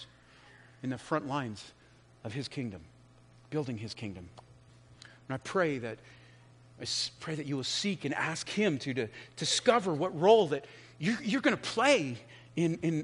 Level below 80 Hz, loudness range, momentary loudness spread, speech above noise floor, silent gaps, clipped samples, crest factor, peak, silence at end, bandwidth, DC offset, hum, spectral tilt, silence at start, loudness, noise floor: -70 dBFS; 13 LU; 18 LU; 27 dB; none; under 0.1%; 22 dB; -10 dBFS; 0 s; 10.5 kHz; under 0.1%; 60 Hz at -60 dBFS; -4.5 dB/octave; 0 s; -32 LUFS; -59 dBFS